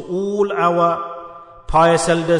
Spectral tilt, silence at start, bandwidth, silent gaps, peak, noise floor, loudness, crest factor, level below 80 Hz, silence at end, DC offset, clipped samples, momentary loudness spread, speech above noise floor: -5 dB/octave; 0 s; 11 kHz; none; -4 dBFS; -37 dBFS; -17 LUFS; 14 dB; -38 dBFS; 0 s; under 0.1%; under 0.1%; 17 LU; 22 dB